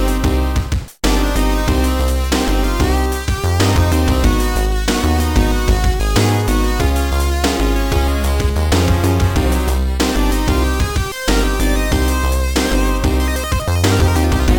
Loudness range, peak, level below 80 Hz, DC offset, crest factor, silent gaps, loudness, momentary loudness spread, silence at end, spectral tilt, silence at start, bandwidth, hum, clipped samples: 1 LU; 0 dBFS; -18 dBFS; under 0.1%; 14 dB; none; -16 LUFS; 4 LU; 0 s; -5 dB/octave; 0 s; 19 kHz; none; under 0.1%